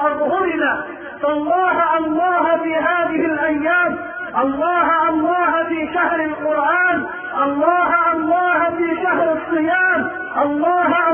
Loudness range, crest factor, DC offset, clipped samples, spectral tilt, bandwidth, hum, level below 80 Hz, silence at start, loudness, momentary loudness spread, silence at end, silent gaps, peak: 1 LU; 12 dB; under 0.1%; under 0.1%; -10 dB/octave; 3.5 kHz; none; -54 dBFS; 0 s; -17 LUFS; 5 LU; 0 s; none; -4 dBFS